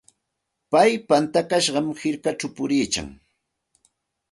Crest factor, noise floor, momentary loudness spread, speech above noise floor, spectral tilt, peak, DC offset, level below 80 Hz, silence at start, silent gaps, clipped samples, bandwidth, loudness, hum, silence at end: 20 dB; -79 dBFS; 9 LU; 58 dB; -4 dB/octave; -4 dBFS; under 0.1%; -56 dBFS; 0.7 s; none; under 0.1%; 11.5 kHz; -22 LUFS; none; 1.2 s